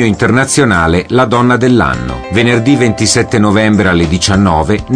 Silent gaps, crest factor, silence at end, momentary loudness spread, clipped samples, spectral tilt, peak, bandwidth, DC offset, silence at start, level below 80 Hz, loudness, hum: none; 10 dB; 0 s; 3 LU; under 0.1%; -5 dB/octave; 0 dBFS; 10.5 kHz; under 0.1%; 0 s; -28 dBFS; -10 LUFS; none